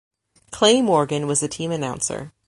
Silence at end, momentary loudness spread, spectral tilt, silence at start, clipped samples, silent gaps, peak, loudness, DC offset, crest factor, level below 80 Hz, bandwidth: 0.2 s; 10 LU; -3.5 dB/octave; 0.5 s; under 0.1%; none; -2 dBFS; -20 LUFS; under 0.1%; 20 dB; -56 dBFS; 11.5 kHz